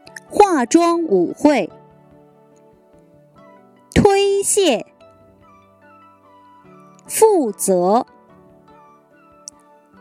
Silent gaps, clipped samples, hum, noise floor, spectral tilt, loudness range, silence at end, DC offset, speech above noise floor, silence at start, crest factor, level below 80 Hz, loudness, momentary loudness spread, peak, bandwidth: none; under 0.1%; none; -50 dBFS; -4.5 dB/octave; 3 LU; 2 s; under 0.1%; 35 dB; 0.15 s; 20 dB; -46 dBFS; -16 LUFS; 18 LU; 0 dBFS; 16 kHz